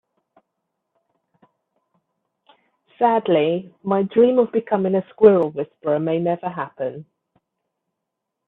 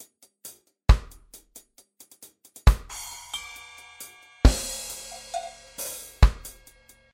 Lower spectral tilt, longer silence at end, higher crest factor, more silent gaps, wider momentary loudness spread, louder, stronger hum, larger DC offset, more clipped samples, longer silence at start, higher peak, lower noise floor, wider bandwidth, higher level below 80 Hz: first, -10.5 dB/octave vs -4.5 dB/octave; first, 1.45 s vs 0.65 s; about the same, 22 dB vs 22 dB; neither; second, 13 LU vs 24 LU; first, -20 LUFS vs -27 LUFS; neither; neither; neither; first, 3 s vs 0.45 s; first, 0 dBFS vs -4 dBFS; first, -81 dBFS vs -56 dBFS; second, 4 kHz vs 16.5 kHz; second, -66 dBFS vs -28 dBFS